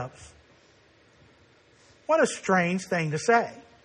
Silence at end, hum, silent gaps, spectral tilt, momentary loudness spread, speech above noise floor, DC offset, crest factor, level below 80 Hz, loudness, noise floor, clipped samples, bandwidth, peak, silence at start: 0.25 s; none; none; -5 dB/octave; 14 LU; 34 dB; under 0.1%; 18 dB; -66 dBFS; -25 LUFS; -59 dBFS; under 0.1%; 10 kHz; -10 dBFS; 0 s